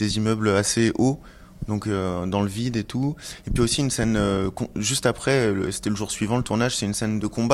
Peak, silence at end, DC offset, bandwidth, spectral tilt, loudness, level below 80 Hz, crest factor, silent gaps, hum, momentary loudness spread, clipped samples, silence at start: -4 dBFS; 0 s; under 0.1%; 15 kHz; -5 dB/octave; -23 LUFS; -42 dBFS; 20 dB; none; none; 7 LU; under 0.1%; 0 s